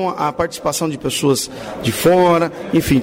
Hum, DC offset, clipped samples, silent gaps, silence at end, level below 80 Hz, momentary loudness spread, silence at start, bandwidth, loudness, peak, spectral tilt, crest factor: none; under 0.1%; under 0.1%; none; 0 s; -42 dBFS; 8 LU; 0 s; 16.5 kHz; -17 LUFS; -6 dBFS; -5 dB/octave; 12 dB